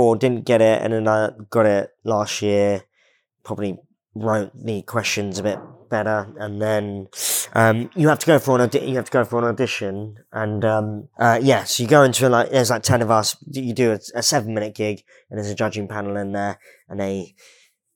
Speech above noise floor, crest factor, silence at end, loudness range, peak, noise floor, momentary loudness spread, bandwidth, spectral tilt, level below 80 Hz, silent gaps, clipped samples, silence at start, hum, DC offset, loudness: 43 dB; 20 dB; 0.7 s; 7 LU; 0 dBFS; -63 dBFS; 13 LU; 20 kHz; -4.5 dB/octave; -68 dBFS; none; under 0.1%; 0 s; none; under 0.1%; -20 LUFS